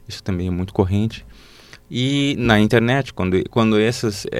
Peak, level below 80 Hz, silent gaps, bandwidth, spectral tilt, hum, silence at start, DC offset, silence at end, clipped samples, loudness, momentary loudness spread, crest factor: -2 dBFS; -42 dBFS; none; 15 kHz; -6 dB/octave; none; 0.1 s; under 0.1%; 0 s; under 0.1%; -19 LUFS; 10 LU; 18 dB